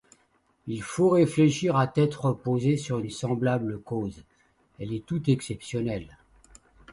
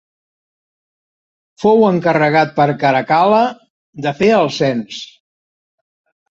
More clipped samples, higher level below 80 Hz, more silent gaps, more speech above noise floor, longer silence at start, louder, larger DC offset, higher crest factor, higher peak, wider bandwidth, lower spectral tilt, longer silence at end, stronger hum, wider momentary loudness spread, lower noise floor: neither; about the same, -56 dBFS vs -58 dBFS; second, none vs 3.70-3.93 s; second, 42 dB vs over 77 dB; second, 0.65 s vs 1.6 s; second, -27 LUFS vs -14 LUFS; neither; about the same, 18 dB vs 14 dB; second, -10 dBFS vs -2 dBFS; first, 11.5 kHz vs 7.8 kHz; about the same, -7 dB/octave vs -6.5 dB/octave; second, 0 s vs 1.25 s; neither; first, 14 LU vs 11 LU; second, -67 dBFS vs under -90 dBFS